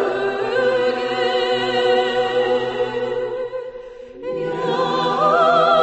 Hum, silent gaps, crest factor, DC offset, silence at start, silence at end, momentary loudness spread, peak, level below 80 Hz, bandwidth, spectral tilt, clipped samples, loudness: none; none; 16 dB; under 0.1%; 0 s; 0 s; 13 LU; -4 dBFS; -56 dBFS; 8.4 kHz; -5 dB/octave; under 0.1%; -19 LUFS